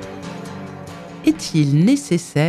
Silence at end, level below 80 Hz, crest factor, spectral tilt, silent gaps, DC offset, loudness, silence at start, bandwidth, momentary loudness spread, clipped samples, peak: 0 s; -54 dBFS; 14 dB; -6 dB/octave; none; under 0.1%; -18 LUFS; 0 s; 13.5 kHz; 18 LU; under 0.1%; -4 dBFS